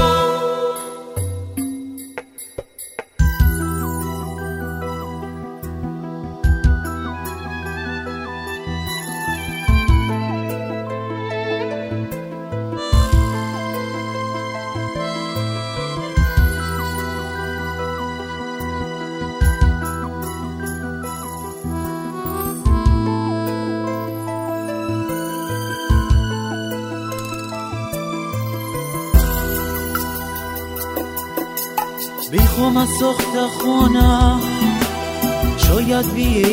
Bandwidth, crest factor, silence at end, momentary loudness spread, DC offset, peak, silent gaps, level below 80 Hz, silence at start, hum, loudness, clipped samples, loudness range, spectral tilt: 16.5 kHz; 20 dB; 0 s; 11 LU; under 0.1%; 0 dBFS; none; -24 dBFS; 0 s; none; -21 LUFS; under 0.1%; 7 LU; -5.5 dB/octave